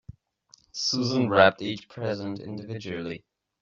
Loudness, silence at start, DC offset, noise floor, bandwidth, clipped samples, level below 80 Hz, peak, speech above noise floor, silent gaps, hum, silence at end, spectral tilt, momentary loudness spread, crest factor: -26 LUFS; 0.75 s; under 0.1%; -60 dBFS; 7.6 kHz; under 0.1%; -64 dBFS; -4 dBFS; 34 dB; none; none; 0.45 s; -3.5 dB/octave; 17 LU; 24 dB